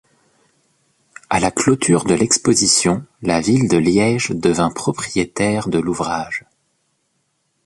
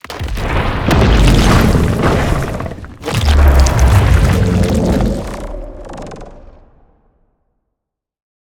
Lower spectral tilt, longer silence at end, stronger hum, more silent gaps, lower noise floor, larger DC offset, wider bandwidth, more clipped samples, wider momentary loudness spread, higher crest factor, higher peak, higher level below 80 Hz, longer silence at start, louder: second, -4 dB/octave vs -6 dB/octave; second, 1.25 s vs 2.15 s; neither; neither; second, -68 dBFS vs -77 dBFS; neither; second, 11.5 kHz vs 17 kHz; neither; second, 8 LU vs 19 LU; about the same, 18 dB vs 14 dB; about the same, -2 dBFS vs 0 dBFS; second, -46 dBFS vs -16 dBFS; first, 1.3 s vs 0.1 s; second, -17 LUFS vs -13 LUFS